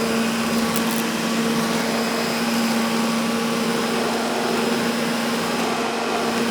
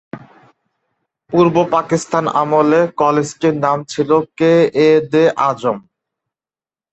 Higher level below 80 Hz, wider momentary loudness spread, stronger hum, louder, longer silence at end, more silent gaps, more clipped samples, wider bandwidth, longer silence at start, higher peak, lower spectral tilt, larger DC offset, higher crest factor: about the same, -56 dBFS vs -58 dBFS; second, 1 LU vs 7 LU; neither; second, -21 LUFS vs -14 LUFS; second, 0 s vs 1.15 s; neither; neither; first, over 20 kHz vs 8.4 kHz; second, 0 s vs 0.15 s; about the same, -4 dBFS vs -2 dBFS; second, -3.5 dB/octave vs -6 dB/octave; neither; about the same, 18 dB vs 14 dB